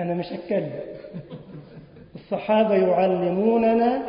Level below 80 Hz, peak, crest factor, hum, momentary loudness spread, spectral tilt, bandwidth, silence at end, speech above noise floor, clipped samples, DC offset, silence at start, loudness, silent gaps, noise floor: -58 dBFS; -8 dBFS; 16 dB; none; 21 LU; -11.5 dB/octave; 5.4 kHz; 0 s; 23 dB; under 0.1%; under 0.1%; 0 s; -22 LUFS; none; -45 dBFS